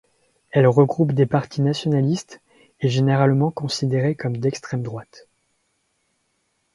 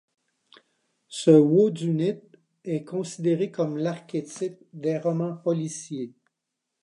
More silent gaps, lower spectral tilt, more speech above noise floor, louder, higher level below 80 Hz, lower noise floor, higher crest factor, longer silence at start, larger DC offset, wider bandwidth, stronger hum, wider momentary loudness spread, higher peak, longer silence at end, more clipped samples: neither; about the same, -7 dB/octave vs -7 dB/octave; second, 50 dB vs 59 dB; first, -20 LUFS vs -25 LUFS; first, -60 dBFS vs -78 dBFS; second, -70 dBFS vs -83 dBFS; about the same, 20 dB vs 22 dB; second, 0.55 s vs 1.1 s; neither; about the same, 11.5 kHz vs 11 kHz; neither; second, 11 LU vs 17 LU; about the same, -2 dBFS vs -4 dBFS; first, 1.55 s vs 0.75 s; neither